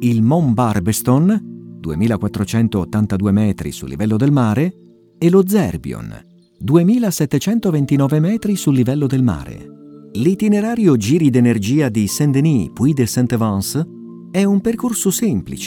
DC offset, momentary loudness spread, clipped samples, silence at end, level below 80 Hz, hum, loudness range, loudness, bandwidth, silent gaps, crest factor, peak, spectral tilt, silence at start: under 0.1%; 11 LU; under 0.1%; 0 s; -44 dBFS; none; 2 LU; -16 LUFS; 18.5 kHz; none; 16 dB; 0 dBFS; -6.5 dB/octave; 0 s